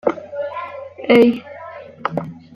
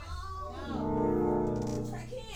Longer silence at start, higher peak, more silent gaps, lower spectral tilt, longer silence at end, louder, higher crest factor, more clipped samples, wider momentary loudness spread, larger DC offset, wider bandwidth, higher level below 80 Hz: about the same, 0.05 s vs 0 s; first, -2 dBFS vs -18 dBFS; neither; about the same, -7 dB/octave vs -7.5 dB/octave; first, 0.15 s vs 0 s; first, -18 LUFS vs -33 LUFS; about the same, 18 dB vs 16 dB; neither; first, 21 LU vs 11 LU; neither; second, 12 kHz vs 16.5 kHz; second, -62 dBFS vs -46 dBFS